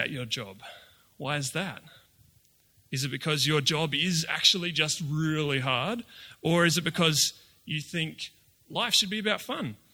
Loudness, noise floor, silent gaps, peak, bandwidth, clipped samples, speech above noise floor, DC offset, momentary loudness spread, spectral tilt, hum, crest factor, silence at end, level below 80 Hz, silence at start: -27 LUFS; -64 dBFS; none; -6 dBFS; 19.5 kHz; under 0.1%; 36 dB; under 0.1%; 14 LU; -3 dB/octave; none; 22 dB; 0.15 s; -66 dBFS; 0 s